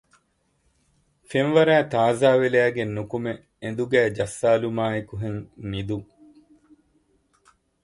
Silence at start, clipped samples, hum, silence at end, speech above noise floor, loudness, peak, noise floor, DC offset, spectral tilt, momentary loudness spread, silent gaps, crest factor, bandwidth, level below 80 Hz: 1.3 s; under 0.1%; none; 1.8 s; 46 dB; -23 LUFS; -6 dBFS; -68 dBFS; under 0.1%; -6 dB/octave; 14 LU; none; 20 dB; 11.5 kHz; -54 dBFS